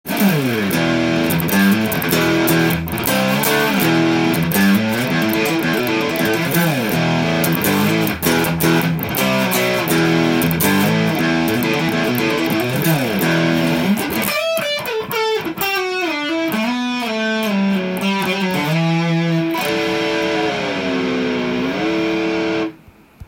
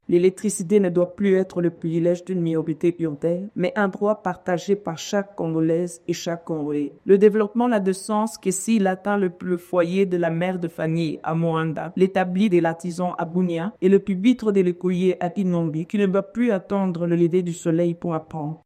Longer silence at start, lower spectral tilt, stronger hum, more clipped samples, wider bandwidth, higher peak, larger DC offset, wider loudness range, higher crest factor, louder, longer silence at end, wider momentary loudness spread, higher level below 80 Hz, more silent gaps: about the same, 0.05 s vs 0.1 s; second, -5 dB/octave vs -6.5 dB/octave; neither; neither; first, 17 kHz vs 14.5 kHz; first, 0 dBFS vs -4 dBFS; neither; about the same, 3 LU vs 3 LU; about the same, 16 dB vs 18 dB; first, -17 LUFS vs -22 LUFS; about the same, 0.05 s vs 0.1 s; about the same, 5 LU vs 7 LU; first, -48 dBFS vs -64 dBFS; neither